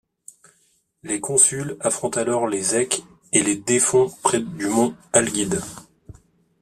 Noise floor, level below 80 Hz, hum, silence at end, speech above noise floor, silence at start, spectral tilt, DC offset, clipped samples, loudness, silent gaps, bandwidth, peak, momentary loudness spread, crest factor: -64 dBFS; -58 dBFS; none; 0.5 s; 43 dB; 1.05 s; -3 dB/octave; under 0.1%; under 0.1%; -20 LUFS; none; 14.5 kHz; 0 dBFS; 9 LU; 22 dB